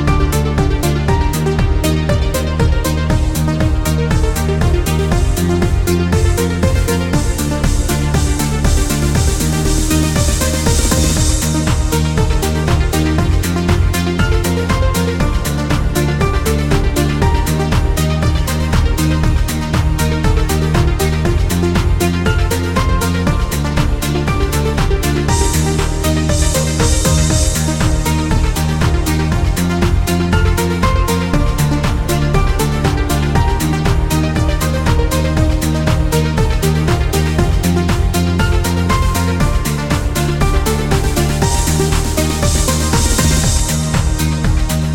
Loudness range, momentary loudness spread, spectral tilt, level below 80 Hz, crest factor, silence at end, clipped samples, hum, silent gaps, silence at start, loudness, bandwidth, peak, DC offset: 1 LU; 2 LU; -5 dB/octave; -18 dBFS; 14 dB; 0 s; under 0.1%; none; none; 0 s; -15 LUFS; 17.5 kHz; 0 dBFS; 1%